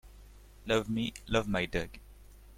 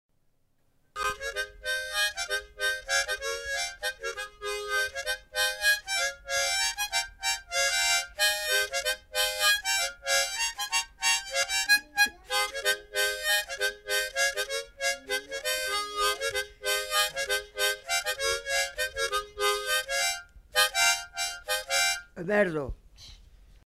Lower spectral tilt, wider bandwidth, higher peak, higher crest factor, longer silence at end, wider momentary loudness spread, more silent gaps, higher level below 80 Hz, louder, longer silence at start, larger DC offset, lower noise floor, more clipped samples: first, -5 dB/octave vs 0.5 dB/octave; about the same, 16.5 kHz vs 16 kHz; second, -14 dBFS vs -10 dBFS; about the same, 22 dB vs 20 dB; second, 0 s vs 0.45 s; first, 16 LU vs 8 LU; neither; first, -48 dBFS vs -54 dBFS; second, -33 LUFS vs -27 LUFS; second, 0.05 s vs 0.95 s; neither; second, -53 dBFS vs -68 dBFS; neither